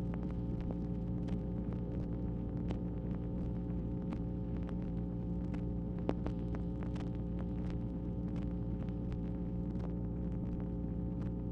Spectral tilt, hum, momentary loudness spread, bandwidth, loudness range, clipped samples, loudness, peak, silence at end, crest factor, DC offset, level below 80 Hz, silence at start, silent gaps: -10.5 dB/octave; none; 1 LU; 5.6 kHz; 0 LU; under 0.1%; -40 LUFS; -16 dBFS; 0 s; 22 dB; under 0.1%; -44 dBFS; 0 s; none